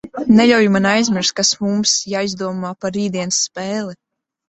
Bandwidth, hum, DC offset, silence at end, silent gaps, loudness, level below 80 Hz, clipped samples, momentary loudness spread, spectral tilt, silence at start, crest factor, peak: 8.2 kHz; none; under 0.1%; 0.55 s; none; -16 LUFS; -56 dBFS; under 0.1%; 12 LU; -3.5 dB/octave; 0.05 s; 16 dB; -2 dBFS